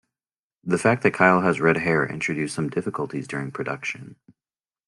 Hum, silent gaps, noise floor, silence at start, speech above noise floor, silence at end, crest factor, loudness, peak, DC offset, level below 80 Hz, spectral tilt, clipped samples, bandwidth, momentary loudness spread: none; none; under -90 dBFS; 0.65 s; over 67 dB; 0.75 s; 22 dB; -23 LUFS; -2 dBFS; under 0.1%; -62 dBFS; -6 dB/octave; under 0.1%; 11.5 kHz; 12 LU